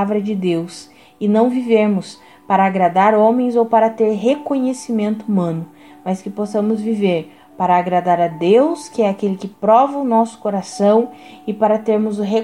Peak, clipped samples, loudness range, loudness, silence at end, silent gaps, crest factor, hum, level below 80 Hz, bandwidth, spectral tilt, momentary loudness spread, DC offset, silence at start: -2 dBFS; under 0.1%; 4 LU; -17 LUFS; 0 s; none; 14 dB; none; -66 dBFS; 11.5 kHz; -7 dB/octave; 10 LU; 0.1%; 0 s